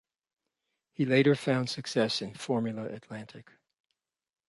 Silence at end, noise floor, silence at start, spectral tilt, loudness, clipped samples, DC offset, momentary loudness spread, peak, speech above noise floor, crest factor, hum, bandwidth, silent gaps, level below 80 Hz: 1.05 s; -84 dBFS; 1 s; -5.5 dB/octave; -29 LUFS; under 0.1%; under 0.1%; 19 LU; -12 dBFS; 55 dB; 20 dB; none; 11.5 kHz; none; -74 dBFS